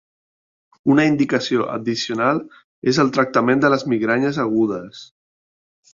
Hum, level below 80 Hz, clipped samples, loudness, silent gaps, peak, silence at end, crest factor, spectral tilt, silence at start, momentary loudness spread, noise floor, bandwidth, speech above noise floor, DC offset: none; -60 dBFS; under 0.1%; -19 LUFS; 2.64-2.82 s; -2 dBFS; 0.9 s; 18 dB; -5.5 dB/octave; 0.85 s; 8 LU; under -90 dBFS; 7.6 kHz; over 72 dB; under 0.1%